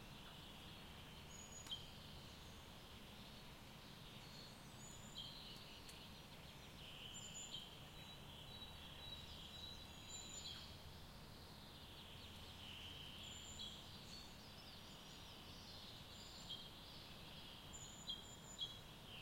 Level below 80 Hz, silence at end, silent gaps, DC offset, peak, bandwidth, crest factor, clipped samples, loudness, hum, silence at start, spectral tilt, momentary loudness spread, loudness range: -68 dBFS; 0 s; none; under 0.1%; -36 dBFS; 16.5 kHz; 20 dB; under 0.1%; -55 LUFS; none; 0 s; -2.5 dB/octave; 7 LU; 2 LU